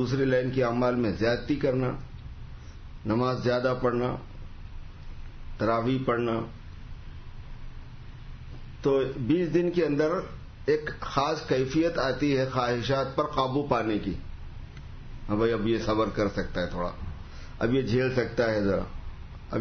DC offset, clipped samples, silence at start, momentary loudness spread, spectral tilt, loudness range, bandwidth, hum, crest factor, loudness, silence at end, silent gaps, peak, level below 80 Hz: under 0.1%; under 0.1%; 0 s; 20 LU; -7 dB/octave; 5 LU; 6.6 kHz; none; 18 dB; -27 LUFS; 0 s; none; -10 dBFS; -42 dBFS